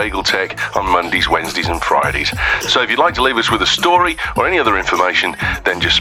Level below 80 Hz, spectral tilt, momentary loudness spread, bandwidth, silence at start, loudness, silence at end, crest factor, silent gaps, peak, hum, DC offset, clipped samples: -34 dBFS; -3 dB/octave; 5 LU; 17 kHz; 0 s; -14 LUFS; 0 s; 16 dB; none; 0 dBFS; none; under 0.1%; under 0.1%